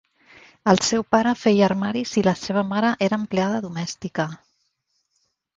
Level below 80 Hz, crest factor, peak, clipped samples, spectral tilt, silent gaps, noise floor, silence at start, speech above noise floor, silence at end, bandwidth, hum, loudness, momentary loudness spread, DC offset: -58 dBFS; 22 dB; 0 dBFS; under 0.1%; -5 dB/octave; none; -72 dBFS; 0.65 s; 51 dB; 1.2 s; 8 kHz; none; -22 LUFS; 10 LU; under 0.1%